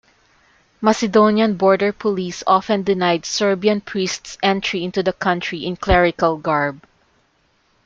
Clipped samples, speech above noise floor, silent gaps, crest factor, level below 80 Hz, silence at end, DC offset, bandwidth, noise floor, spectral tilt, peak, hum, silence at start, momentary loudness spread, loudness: under 0.1%; 44 dB; none; 16 dB; -38 dBFS; 1.1 s; under 0.1%; 7.8 kHz; -61 dBFS; -5 dB/octave; -2 dBFS; none; 0.8 s; 8 LU; -18 LUFS